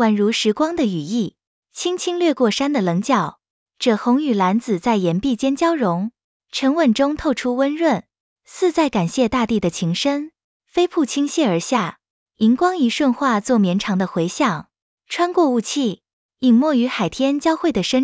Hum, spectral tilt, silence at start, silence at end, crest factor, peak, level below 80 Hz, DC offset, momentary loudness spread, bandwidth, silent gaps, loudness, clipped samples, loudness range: none; -5 dB/octave; 0 s; 0 s; 16 dB; -4 dBFS; -52 dBFS; under 0.1%; 7 LU; 8 kHz; 1.47-1.62 s, 3.50-3.66 s, 6.24-6.40 s, 8.20-8.36 s, 10.44-10.60 s, 12.10-12.26 s, 14.82-14.97 s, 16.13-16.29 s; -19 LUFS; under 0.1%; 2 LU